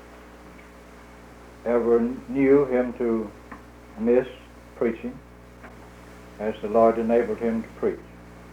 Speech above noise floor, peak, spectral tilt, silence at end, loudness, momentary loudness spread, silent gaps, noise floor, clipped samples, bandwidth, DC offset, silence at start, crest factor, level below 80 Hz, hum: 24 dB; -6 dBFS; -8 dB/octave; 0 s; -24 LUFS; 26 LU; none; -46 dBFS; under 0.1%; 11.5 kHz; under 0.1%; 0.05 s; 18 dB; -50 dBFS; 60 Hz at -50 dBFS